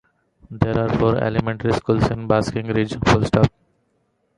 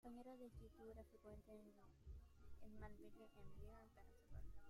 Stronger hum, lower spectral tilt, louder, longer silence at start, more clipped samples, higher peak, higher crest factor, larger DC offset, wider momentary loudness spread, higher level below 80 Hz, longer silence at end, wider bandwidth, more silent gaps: neither; about the same, -7 dB/octave vs -7.5 dB/octave; first, -20 LUFS vs -64 LUFS; first, 0.5 s vs 0.05 s; neither; first, -2 dBFS vs -42 dBFS; about the same, 20 dB vs 16 dB; neither; about the same, 5 LU vs 7 LU; first, -38 dBFS vs -66 dBFS; first, 0.9 s vs 0 s; second, 11 kHz vs 15.5 kHz; neither